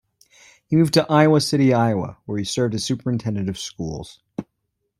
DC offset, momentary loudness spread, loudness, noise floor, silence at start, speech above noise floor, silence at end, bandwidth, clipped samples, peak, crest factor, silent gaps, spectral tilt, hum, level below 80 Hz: under 0.1%; 19 LU; -20 LUFS; -75 dBFS; 0.7 s; 55 dB; 0.55 s; 15.5 kHz; under 0.1%; -4 dBFS; 18 dB; none; -6 dB/octave; none; -54 dBFS